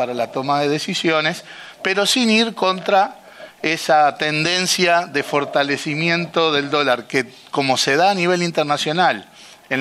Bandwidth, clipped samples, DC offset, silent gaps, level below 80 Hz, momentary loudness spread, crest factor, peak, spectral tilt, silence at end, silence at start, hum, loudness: 13.5 kHz; under 0.1%; under 0.1%; none; -66 dBFS; 7 LU; 16 dB; -2 dBFS; -3.5 dB/octave; 0 s; 0 s; none; -18 LUFS